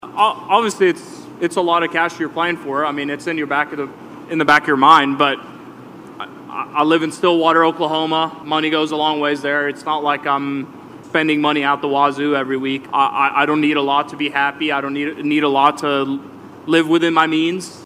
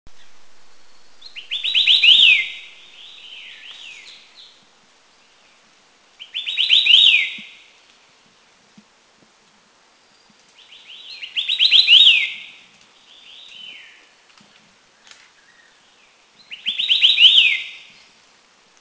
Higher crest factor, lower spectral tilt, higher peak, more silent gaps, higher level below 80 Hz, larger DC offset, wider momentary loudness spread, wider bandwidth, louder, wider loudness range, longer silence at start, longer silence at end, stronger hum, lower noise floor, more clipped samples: about the same, 18 dB vs 20 dB; first, -4.5 dB/octave vs 2.5 dB/octave; about the same, 0 dBFS vs 0 dBFS; neither; about the same, -66 dBFS vs -68 dBFS; neither; second, 14 LU vs 28 LU; first, 14.5 kHz vs 8 kHz; second, -17 LUFS vs -12 LUFS; second, 3 LU vs 12 LU; about the same, 0.05 s vs 0.05 s; second, 0 s vs 1.05 s; neither; second, -37 dBFS vs -55 dBFS; neither